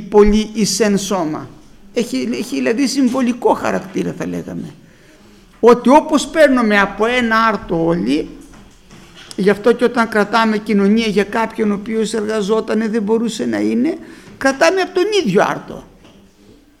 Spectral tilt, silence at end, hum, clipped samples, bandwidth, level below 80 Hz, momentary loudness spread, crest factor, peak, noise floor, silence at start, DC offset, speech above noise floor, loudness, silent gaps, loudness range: -5 dB/octave; 0.95 s; none; under 0.1%; 15 kHz; -38 dBFS; 12 LU; 16 dB; 0 dBFS; -46 dBFS; 0 s; under 0.1%; 32 dB; -15 LUFS; none; 5 LU